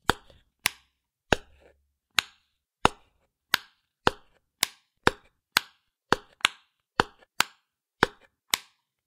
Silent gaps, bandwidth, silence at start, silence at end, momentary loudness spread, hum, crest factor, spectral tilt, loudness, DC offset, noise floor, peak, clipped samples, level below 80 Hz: none; 16.5 kHz; 0.1 s; 0.5 s; 3 LU; none; 32 dB; -2 dB/octave; -29 LUFS; under 0.1%; -72 dBFS; 0 dBFS; under 0.1%; -50 dBFS